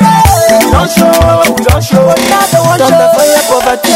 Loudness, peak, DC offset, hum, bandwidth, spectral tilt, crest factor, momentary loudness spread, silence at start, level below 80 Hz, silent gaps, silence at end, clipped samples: -6 LUFS; 0 dBFS; under 0.1%; none; 17 kHz; -4.5 dB/octave; 6 dB; 2 LU; 0 s; -20 dBFS; none; 0 s; 2%